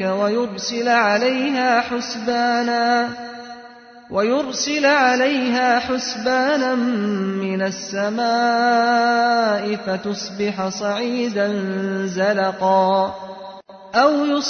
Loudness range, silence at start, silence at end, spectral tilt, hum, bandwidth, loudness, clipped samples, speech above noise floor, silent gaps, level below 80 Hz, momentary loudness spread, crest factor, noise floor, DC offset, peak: 2 LU; 0 s; 0 s; -4 dB/octave; none; 6.6 kHz; -19 LUFS; under 0.1%; 23 dB; none; -62 dBFS; 8 LU; 16 dB; -42 dBFS; under 0.1%; -4 dBFS